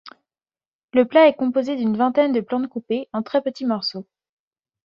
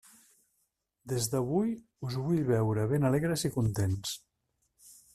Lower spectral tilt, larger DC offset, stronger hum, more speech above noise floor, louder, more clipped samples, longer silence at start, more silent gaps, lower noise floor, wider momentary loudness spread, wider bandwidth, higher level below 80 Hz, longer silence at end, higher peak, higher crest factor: about the same, -6.5 dB/octave vs -6 dB/octave; neither; neither; first, over 70 dB vs 49 dB; first, -20 LUFS vs -31 LUFS; neither; second, 0.05 s vs 1.05 s; first, 0.67-0.88 s vs none; first, under -90 dBFS vs -78 dBFS; about the same, 11 LU vs 10 LU; second, 7 kHz vs 14 kHz; second, -68 dBFS vs -58 dBFS; first, 0.85 s vs 0.2 s; first, -2 dBFS vs -14 dBFS; about the same, 18 dB vs 18 dB